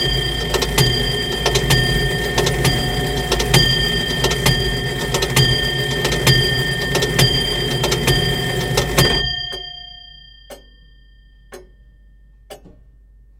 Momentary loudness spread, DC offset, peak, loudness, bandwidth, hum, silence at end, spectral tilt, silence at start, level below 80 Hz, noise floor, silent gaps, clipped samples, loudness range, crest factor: 6 LU; under 0.1%; 0 dBFS; -16 LUFS; 17 kHz; none; 0.7 s; -3.5 dB/octave; 0 s; -30 dBFS; -47 dBFS; none; under 0.1%; 6 LU; 18 dB